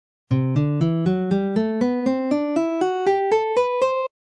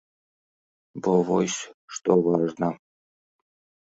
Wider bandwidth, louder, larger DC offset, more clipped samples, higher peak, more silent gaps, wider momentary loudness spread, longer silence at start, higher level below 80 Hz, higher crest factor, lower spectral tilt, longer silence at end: first, 10 kHz vs 8 kHz; first, -21 LUFS vs -24 LUFS; neither; neither; about the same, -8 dBFS vs -6 dBFS; second, none vs 1.74-1.88 s; second, 3 LU vs 15 LU; second, 0.3 s vs 0.95 s; first, -54 dBFS vs -68 dBFS; second, 12 dB vs 20 dB; first, -8 dB/octave vs -5.5 dB/octave; second, 0.25 s vs 1.1 s